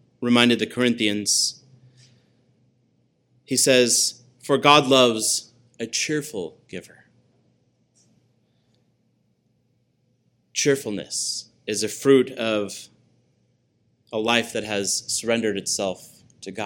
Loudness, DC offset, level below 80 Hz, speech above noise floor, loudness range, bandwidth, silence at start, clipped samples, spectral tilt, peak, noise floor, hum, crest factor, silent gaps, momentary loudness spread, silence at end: -21 LUFS; under 0.1%; -70 dBFS; 46 dB; 12 LU; 17.5 kHz; 0.2 s; under 0.1%; -2.5 dB/octave; 0 dBFS; -67 dBFS; none; 24 dB; none; 18 LU; 0 s